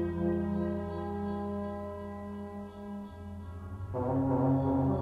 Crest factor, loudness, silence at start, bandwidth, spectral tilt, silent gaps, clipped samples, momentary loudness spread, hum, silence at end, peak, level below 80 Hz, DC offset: 14 dB; -34 LUFS; 0 s; 4.8 kHz; -10.5 dB/octave; none; under 0.1%; 15 LU; none; 0 s; -18 dBFS; -52 dBFS; under 0.1%